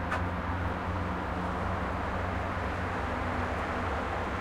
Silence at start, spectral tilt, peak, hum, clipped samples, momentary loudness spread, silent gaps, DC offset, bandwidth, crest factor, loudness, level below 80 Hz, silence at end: 0 s; -7 dB/octave; -18 dBFS; none; under 0.1%; 1 LU; none; under 0.1%; 12 kHz; 14 dB; -33 LUFS; -42 dBFS; 0 s